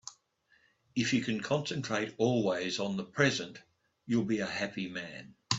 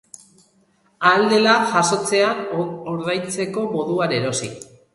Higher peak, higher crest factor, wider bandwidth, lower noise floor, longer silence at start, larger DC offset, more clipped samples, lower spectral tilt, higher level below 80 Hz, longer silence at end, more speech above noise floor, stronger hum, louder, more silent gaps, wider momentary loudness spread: second, -10 dBFS vs -2 dBFS; about the same, 22 dB vs 20 dB; second, 8 kHz vs 11.5 kHz; first, -70 dBFS vs -60 dBFS; second, 0.05 s vs 1 s; neither; neither; about the same, -4.5 dB/octave vs -3.5 dB/octave; second, -70 dBFS vs -62 dBFS; second, 0 s vs 0.3 s; about the same, 38 dB vs 41 dB; neither; second, -32 LUFS vs -19 LUFS; neither; about the same, 11 LU vs 11 LU